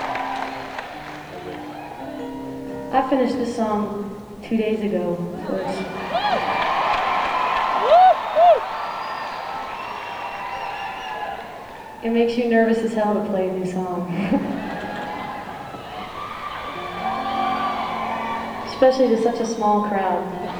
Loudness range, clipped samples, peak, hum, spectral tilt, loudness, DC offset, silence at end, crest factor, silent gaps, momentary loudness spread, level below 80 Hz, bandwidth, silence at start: 9 LU; under 0.1%; -4 dBFS; none; -5.5 dB/octave; -22 LUFS; under 0.1%; 0 s; 18 dB; none; 16 LU; -52 dBFS; over 20 kHz; 0 s